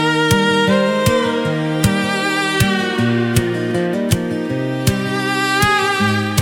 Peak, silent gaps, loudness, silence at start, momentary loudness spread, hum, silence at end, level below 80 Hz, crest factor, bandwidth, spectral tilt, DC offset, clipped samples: -2 dBFS; none; -16 LUFS; 0 s; 5 LU; none; 0 s; -40 dBFS; 14 dB; 18 kHz; -5 dB/octave; under 0.1%; under 0.1%